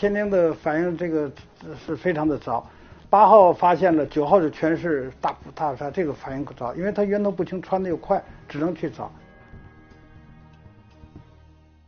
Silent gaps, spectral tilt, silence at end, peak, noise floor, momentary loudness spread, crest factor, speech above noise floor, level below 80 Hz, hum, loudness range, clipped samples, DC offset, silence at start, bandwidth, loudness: none; -6 dB/octave; 0.7 s; -2 dBFS; -52 dBFS; 15 LU; 22 dB; 30 dB; -52 dBFS; none; 12 LU; under 0.1%; under 0.1%; 0 s; 6.6 kHz; -22 LUFS